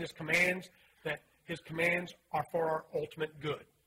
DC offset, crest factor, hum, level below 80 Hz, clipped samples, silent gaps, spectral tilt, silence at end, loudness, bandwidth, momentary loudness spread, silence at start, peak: under 0.1%; 20 dB; none; -70 dBFS; under 0.1%; none; -4.5 dB/octave; 0.25 s; -34 LUFS; 16 kHz; 13 LU; 0 s; -16 dBFS